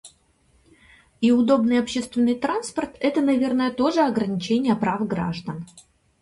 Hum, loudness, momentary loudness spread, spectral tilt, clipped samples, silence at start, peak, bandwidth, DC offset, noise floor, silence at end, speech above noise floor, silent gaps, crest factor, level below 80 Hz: none; -22 LUFS; 10 LU; -6 dB/octave; under 0.1%; 0.05 s; -6 dBFS; 11.5 kHz; under 0.1%; -61 dBFS; 0.4 s; 40 dB; none; 16 dB; -58 dBFS